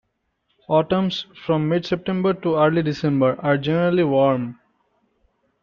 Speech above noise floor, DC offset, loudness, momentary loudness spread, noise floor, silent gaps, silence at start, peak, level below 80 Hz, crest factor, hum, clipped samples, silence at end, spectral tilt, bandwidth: 51 dB; under 0.1%; -20 LUFS; 6 LU; -71 dBFS; none; 0.7 s; -6 dBFS; -58 dBFS; 16 dB; none; under 0.1%; 1.1 s; -8 dB/octave; 7 kHz